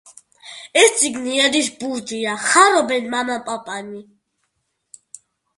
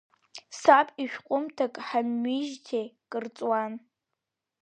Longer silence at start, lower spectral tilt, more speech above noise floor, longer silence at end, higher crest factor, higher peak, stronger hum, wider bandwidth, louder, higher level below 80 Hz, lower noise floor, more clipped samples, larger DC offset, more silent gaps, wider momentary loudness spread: about the same, 0.45 s vs 0.35 s; second, -1 dB/octave vs -4 dB/octave; second, 54 dB vs 58 dB; first, 1.55 s vs 0.85 s; about the same, 20 dB vs 24 dB; first, 0 dBFS vs -4 dBFS; neither; first, 11.5 kHz vs 9.6 kHz; first, -17 LUFS vs -28 LUFS; first, -66 dBFS vs -84 dBFS; second, -72 dBFS vs -86 dBFS; neither; neither; neither; about the same, 19 LU vs 18 LU